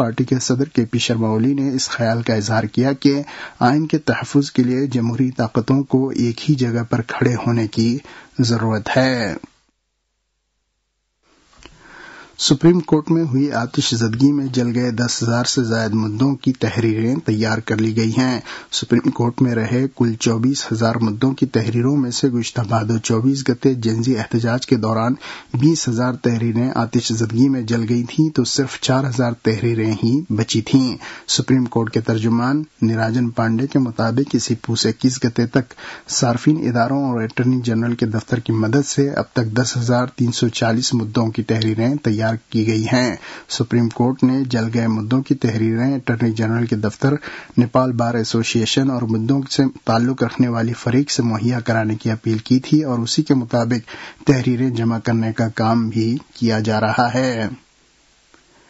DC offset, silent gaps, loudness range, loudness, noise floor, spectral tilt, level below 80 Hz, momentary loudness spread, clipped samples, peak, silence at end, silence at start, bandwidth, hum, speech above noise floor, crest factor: under 0.1%; none; 1 LU; -18 LUFS; -71 dBFS; -5.5 dB/octave; -54 dBFS; 4 LU; under 0.1%; -2 dBFS; 1.15 s; 0 s; 8 kHz; none; 53 dB; 16 dB